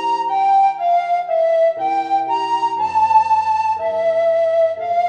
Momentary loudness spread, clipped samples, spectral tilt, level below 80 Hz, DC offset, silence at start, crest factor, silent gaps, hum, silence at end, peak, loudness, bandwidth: 5 LU; under 0.1%; -4 dB/octave; -62 dBFS; under 0.1%; 0 s; 12 dB; none; none; 0 s; -4 dBFS; -17 LUFS; 9 kHz